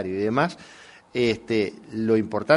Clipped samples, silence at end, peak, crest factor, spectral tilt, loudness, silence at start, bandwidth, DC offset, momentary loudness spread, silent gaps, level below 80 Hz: under 0.1%; 0 s; -4 dBFS; 20 dB; -6.5 dB/octave; -25 LUFS; 0 s; 11 kHz; under 0.1%; 9 LU; none; -60 dBFS